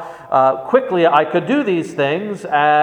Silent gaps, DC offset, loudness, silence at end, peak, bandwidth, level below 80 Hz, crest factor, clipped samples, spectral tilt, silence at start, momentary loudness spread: none; under 0.1%; -16 LUFS; 0 s; 0 dBFS; 10.5 kHz; -64 dBFS; 16 dB; under 0.1%; -6.5 dB/octave; 0 s; 6 LU